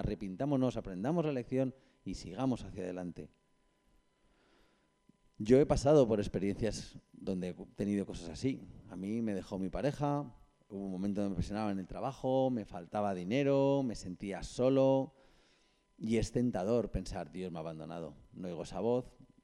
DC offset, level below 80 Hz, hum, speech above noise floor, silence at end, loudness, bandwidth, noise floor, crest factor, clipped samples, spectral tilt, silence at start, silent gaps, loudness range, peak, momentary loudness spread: under 0.1%; -54 dBFS; none; 38 dB; 0.35 s; -35 LUFS; 11.5 kHz; -73 dBFS; 22 dB; under 0.1%; -7 dB/octave; 0 s; none; 6 LU; -14 dBFS; 16 LU